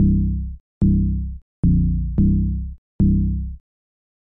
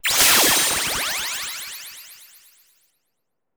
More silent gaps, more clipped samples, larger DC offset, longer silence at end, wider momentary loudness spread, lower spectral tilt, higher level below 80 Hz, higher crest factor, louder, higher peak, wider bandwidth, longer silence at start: first, 0.60-0.81 s, 1.42-1.63 s, 2.78-2.99 s vs none; neither; first, 0.3% vs under 0.1%; second, 0.8 s vs 1.4 s; second, 13 LU vs 22 LU; first, -15 dB/octave vs 0.5 dB/octave; first, -24 dBFS vs -52 dBFS; second, 12 dB vs 20 dB; second, -21 LUFS vs -17 LUFS; second, -8 dBFS vs -4 dBFS; second, 1.2 kHz vs over 20 kHz; about the same, 0 s vs 0.05 s